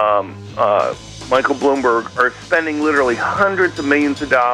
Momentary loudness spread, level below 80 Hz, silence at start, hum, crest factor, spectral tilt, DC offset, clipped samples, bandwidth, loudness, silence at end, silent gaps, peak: 4 LU; -48 dBFS; 0 s; none; 14 dB; -5 dB/octave; under 0.1%; under 0.1%; 11.5 kHz; -16 LUFS; 0 s; none; -2 dBFS